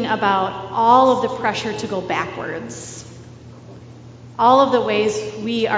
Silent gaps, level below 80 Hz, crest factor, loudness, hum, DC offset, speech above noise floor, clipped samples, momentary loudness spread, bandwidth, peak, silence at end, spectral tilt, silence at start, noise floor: none; -52 dBFS; 18 dB; -18 LUFS; none; under 0.1%; 21 dB; under 0.1%; 18 LU; 8 kHz; 0 dBFS; 0 s; -4.5 dB/octave; 0 s; -40 dBFS